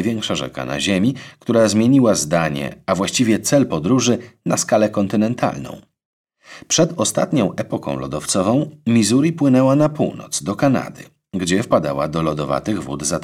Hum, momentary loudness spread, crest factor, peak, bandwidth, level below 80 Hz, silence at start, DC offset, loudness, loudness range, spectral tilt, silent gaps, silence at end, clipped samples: none; 10 LU; 14 dB; -4 dBFS; 15.5 kHz; -50 dBFS; 0 s; under 0.1%; -18 LUFS; 4 LU; -5 dB/octave; 6.05-6.24 s; 0 s; under 0.1%